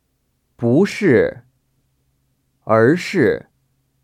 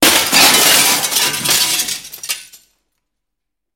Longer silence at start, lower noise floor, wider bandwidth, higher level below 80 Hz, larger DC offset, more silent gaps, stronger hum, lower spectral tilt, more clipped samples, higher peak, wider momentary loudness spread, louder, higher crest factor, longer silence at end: first, 0.6 s vs 0 s; second, -67 dBFS vs -80 dBFS; second, 13.5 kHz vs over 20 kHz; second, -56 dBFS vs -50 dBFS; neither; neither; neither; first, -7 dB/octave vs 0 dB/octave; neither; about the same, 0 dBFS vs 0 dBFS; second, 9 LU vs 16 LU; second, -16 LUFS vs -10 LUFS; about the same, 18 dB vs 16 dB; second, 0.65 s vs 1.3 s